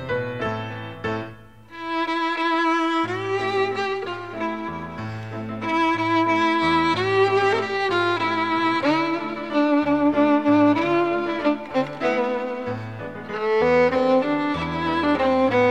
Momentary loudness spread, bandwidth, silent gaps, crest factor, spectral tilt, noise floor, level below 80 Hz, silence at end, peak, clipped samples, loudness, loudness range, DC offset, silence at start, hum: 13 LU; 9.6 kHz; none; 14 dB; -6 dB/octave; -43 dBFS; -54 dBFS; 0 s; -8 dBFS; under 0.1%; -22 LUFS; 4 LU; 0.3%; 0 s; none